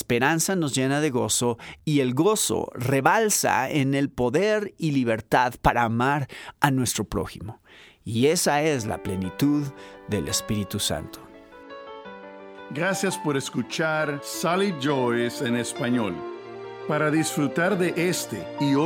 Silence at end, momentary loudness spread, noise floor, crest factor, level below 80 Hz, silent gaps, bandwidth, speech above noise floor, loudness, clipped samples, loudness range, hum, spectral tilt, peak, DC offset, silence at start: 0 s; 16 LU; -45 dBFS; 20 dB; -50 dBFS; none; over 20 kHz; 21 dB; -24 LUFS; under 0.1%; 6 LU; none; -4.5 dB/octave; -4 dBFS; under 0.1%; 0 s